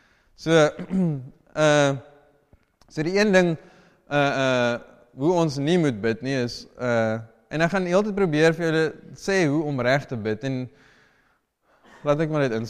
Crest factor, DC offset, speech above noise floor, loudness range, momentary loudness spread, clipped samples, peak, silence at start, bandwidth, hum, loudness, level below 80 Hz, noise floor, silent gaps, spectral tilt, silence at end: 18 dB; under 0.1%; 44 dB; 3 LU; 13 LU; under 0.1%; -6 dBFS; 0.4 s; 12.5 kHz; none; -23 LUFS; -56 dBFS; -66 dBFS; none; -6 dB/octave; 0 s